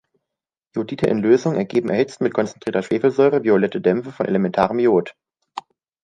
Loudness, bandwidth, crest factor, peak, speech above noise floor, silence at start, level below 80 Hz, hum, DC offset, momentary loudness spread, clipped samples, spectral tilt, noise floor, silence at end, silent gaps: -19 LUFS; 9.4 kHz; 18 dB; -2 dBFS; 66 dB; 0.75 s; -58 dBFS; none; under 0.1%; 14 LU; under 0.1%; -7 dB/octave; -85 dBFS; 0.45 s; none